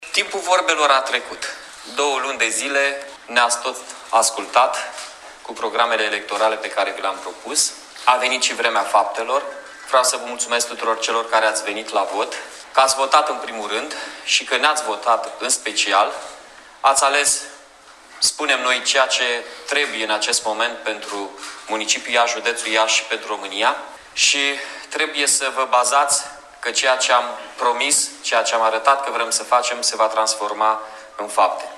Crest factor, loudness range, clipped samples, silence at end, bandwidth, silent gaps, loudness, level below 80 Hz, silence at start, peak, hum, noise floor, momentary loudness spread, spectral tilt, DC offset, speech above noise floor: 20 dB; 2 LU; under 0.1%; 0 s; 15.5 kHz; none; -19 LUFS; -64 dBFS; 0 s; 0 dBFS; none; -45 dBFS; 12 LU; 1.5 dB/octave; under 0.1%; 26 dB